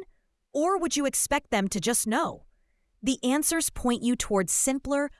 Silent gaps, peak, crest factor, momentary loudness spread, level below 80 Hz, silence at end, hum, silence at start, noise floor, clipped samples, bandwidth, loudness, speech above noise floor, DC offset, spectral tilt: none; -10 dBFS; 18 dB; 5 LU; -50 dBFS; 0.1 s; none; 0 s; -68 dBFS; under 0.1%; 12 kHz; -26 LUFS; 42 dB; under 0.1%; -3 dB/octave